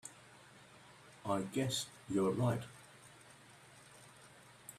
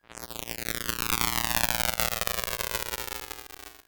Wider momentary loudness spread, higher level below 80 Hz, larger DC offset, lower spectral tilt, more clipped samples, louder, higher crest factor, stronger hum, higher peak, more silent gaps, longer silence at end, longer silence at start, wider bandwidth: first, 23 LU vs 13 LU; second, -74 dBFS vs -46 dBFS; neither; first, -5 dB/octave vs -1.5 dB/octave; neither; second, -38 LUFS vs -28 LUFS; second, 20 dB vs 32 dB; neither; second, -22 dBFS vs 0 dBFS; neither; about the same, 0 s vs 0.05 s; about the same, 0.05 s vs 0.1 s; second, 15 kHz vs over 20 kHz